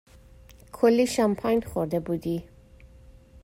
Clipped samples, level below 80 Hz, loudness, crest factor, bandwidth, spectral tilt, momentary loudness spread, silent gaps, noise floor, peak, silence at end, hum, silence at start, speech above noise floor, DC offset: under 0.1%; -52 dBFS; -25 LUFS; 18 dB; 16 kHz; -6 dB/octave; 11 LU; none; -51 dBFS; -8 dBFS; 0.05 s; none; 0.75 s; 27 dB; under 0.1%